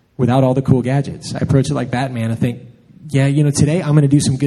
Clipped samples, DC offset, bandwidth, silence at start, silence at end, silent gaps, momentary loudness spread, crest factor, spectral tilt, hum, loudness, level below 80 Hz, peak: under 0.1%; under 0.1%; 12 kHz; 0.2 s; 0 s; none; 8 LU; 16 dB; -6.5 dB/octave; none; -16 LUFS; -44 dBFS; 0 dBFS